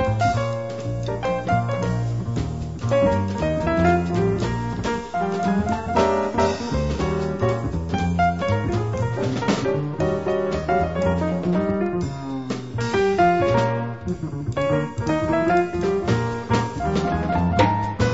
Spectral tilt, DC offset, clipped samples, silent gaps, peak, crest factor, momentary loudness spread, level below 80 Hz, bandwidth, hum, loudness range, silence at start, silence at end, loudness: -7 dB/octave; 0.5%; under 0.1%; none; -4 dBFS; 18 dB; 8 LU; -38 dBFS; 8 kHz; none; 2 LU; 0 s; 0 s; -22 LUFS